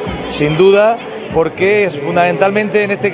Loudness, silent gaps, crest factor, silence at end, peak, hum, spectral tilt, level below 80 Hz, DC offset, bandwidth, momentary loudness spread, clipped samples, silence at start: -13 LUFS; none; 12 dB; 0 s; 0 dBFS; none; -10 dB/octave; -40 dBFS; under 0.1%; 4 kHz; 8 LU; under 0.1%; 0 s